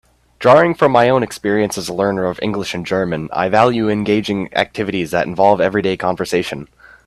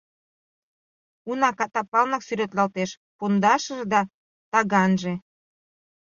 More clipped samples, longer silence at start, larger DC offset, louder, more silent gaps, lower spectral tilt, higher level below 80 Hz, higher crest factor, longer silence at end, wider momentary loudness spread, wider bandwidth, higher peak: neither; second, 0.4 s vs 1.25 s; neither; first, -16 LUFS vs -23 LUFS; second, none vs 1.88-1.92 s, 2.97-3.19 s, 4.14-4.52 s; about the same, -5.5 dB/octave vs -5.5 dB/octave; first, -50 dBFS vs -68 dBFS; second, 16 dB vs 22 dB; second, 0.4 s vs 0.85 s; second, 8 LU vs 11 LU; first, 13.5 kHz vs 7.4 kHz; first, 0 dBFS vs -4 dBFS